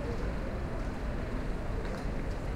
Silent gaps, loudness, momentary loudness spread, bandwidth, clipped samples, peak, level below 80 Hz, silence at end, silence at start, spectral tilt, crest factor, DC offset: none; -37 LUFS; 1 LU; 12 kHz; under 0.1%; -22 dBFS; -36 dBFS; 0 s; 0 s; -7 dB/octave; 12 dB; under 0.1%